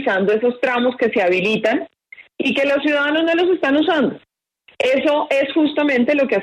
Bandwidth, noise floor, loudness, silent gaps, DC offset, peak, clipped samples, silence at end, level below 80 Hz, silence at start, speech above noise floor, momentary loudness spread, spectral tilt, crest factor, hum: 11 kHz; -55 dBFS; -17 LUFS; none; under 0.1%; -6 dBFS; under 0.1%; 0 s; -64 dBFS; 0 s; 38 dB; 4 LU; -5.5 dB/octave; 12 dB; none